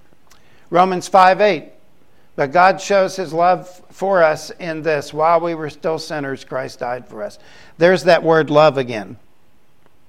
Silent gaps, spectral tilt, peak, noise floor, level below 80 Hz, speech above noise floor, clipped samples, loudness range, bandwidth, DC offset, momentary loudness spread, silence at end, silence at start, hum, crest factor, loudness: none; -5 dB/octave; 0 dBFS; -58 dBFS; -60 dBFS; 42 dB; under 0.1%; 4 LU; 14 kHz; 0.7%; 14 LU; 0.95 s; 0.7 s; none; 18 dB; -16 LUFS